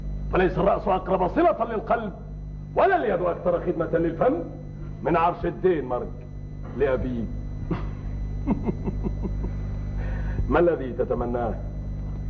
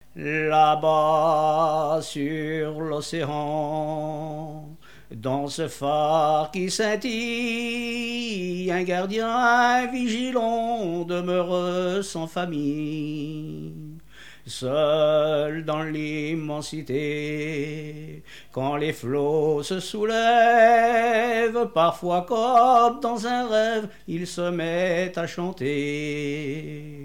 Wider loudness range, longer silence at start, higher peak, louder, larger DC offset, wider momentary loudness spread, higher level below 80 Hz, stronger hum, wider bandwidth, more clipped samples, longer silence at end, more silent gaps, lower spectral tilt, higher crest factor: second, 5 LU vs 8 LU; second, 0 s vs 0.15 s; about the same, -8 dBFS vs -8 dBFS; about the same, -25 LUFS vs -24 LUFS; second, under 0.1% vs 0.4%; about the same, 13 LU vs 13 LU; first, -34 dBFS vs -58 dBFS; first, 50 Hz at -35 dBFS vs none; second, 6.4 kHz vs 16.5 kHz; neither; about the same, 0 s vs 0 s; neither; first, -9.5 dB/octave vs -5 dB/octave; about the same, 16 dB vs 16 dB